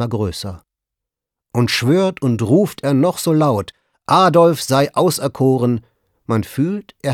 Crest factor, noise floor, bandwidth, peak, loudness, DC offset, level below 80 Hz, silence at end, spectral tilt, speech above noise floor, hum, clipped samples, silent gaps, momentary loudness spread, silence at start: 14 dB; -84 dBFS; 17.5 kHz; -2 dBFS; -16 LUFS; under 0.1%; -50 dBFS; 0 s; -6 dB/octave; 68 dB; none; under 0.1%; none; 12 LU; 0 s